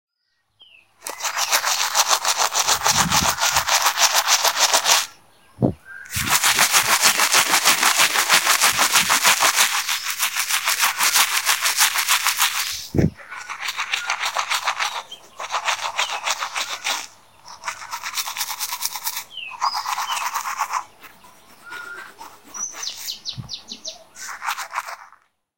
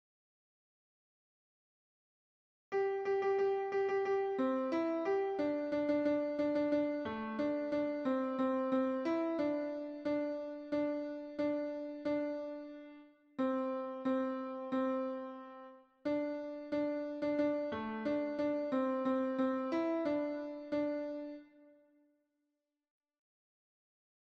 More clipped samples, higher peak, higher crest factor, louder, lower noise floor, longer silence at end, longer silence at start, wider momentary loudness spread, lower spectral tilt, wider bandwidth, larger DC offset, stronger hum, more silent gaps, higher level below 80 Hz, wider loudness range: neither; first, 0 dBFS vs -22 dBFS; first, 22 dB vs 14 dB; first, -18 LUFS vs -36 LUFS; second, -71 dBFS vs -87 dBFS; second, 0.5 s vs 2.7 s; second, 1.05 s vs 2.7 s; first, 18 LU vs 9 LU; second, -0.5 dB/octave vs -7 dB/octave; first, 17 kHz vs 6.8 kHz; first, 0.3% vs under 0.1%; neither; neither; first, -52 dBFS vs -76 dBFS; first, 14 LU vs 5 LU